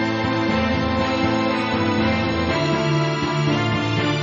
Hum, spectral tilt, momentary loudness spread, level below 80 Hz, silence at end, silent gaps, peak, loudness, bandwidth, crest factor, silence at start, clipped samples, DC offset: none; -4.5 dB/octave; 1 LU; -44 dBFS; 0 s; none; -8 dBFS; -20 LUFS; 7.4 kHz; 12 dB; 0 s; under 0.1%; under 0.1%